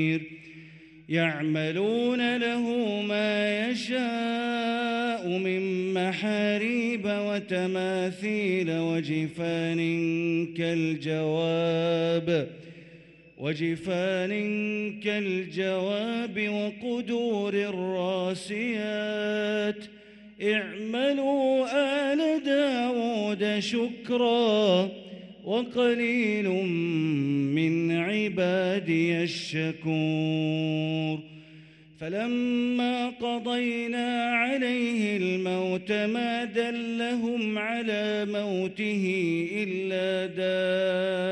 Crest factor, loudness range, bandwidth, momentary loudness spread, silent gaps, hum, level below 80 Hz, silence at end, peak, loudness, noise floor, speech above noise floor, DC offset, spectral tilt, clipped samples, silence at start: 16 dB; 3 LU; 11 kHz; 5 LU; none; none; -70 dBFS; 0 s; -12 dBFS; -27 LUFS; -52 dBFS; 25 dB; under 0.1%; -6 dB/octave; under 0.1%; 0 s